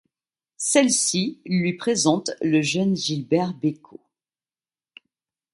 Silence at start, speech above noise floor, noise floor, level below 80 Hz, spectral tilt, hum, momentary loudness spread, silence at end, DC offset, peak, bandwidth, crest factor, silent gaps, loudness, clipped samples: 0.6 s; over 68 dB; under -90 dBFS; -68 dBFS; -4 dB/octave; none; 8 LU; 1.75 s; under 0.1%; -4 dBFS; 11.5 kHz; 20 dB; none; -22 LUFS; under 0.1%